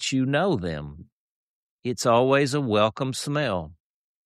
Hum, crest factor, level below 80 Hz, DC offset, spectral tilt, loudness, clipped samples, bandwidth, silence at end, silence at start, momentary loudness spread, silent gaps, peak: none; 18 dB; -54 dBFS; under 0.1%; -5 dB/octave; -24 LUFS; under 0.1%; 13 kHz; 0.55 s; 0 s; 15 LU; 1.12-1.79 s; -8 dBFS